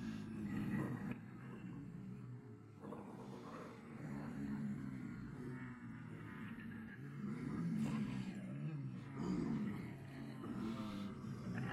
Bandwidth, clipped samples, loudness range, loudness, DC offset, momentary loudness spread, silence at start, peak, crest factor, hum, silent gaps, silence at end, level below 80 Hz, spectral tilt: 13 kHz; under 0.1%; 6 LU; -47 LUFS; under 0.1%; 10 LU; 0 s; -30 dBFS; 16 dB; none; none; 0 s; -68 dBFS; -7.5 dB/octave